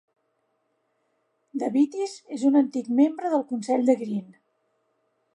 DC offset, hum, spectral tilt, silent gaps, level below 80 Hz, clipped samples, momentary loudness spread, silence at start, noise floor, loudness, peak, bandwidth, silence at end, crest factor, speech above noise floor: under 0.1%; none; -6.5 dB/octave; none; -82 dBFS; under 0.1%; 11 LU; 1.55 s; -73 dBFS; -24 LUFS; -8 dBFS; 10.5 kHz; 1.1 s; 18 dB; 50 dB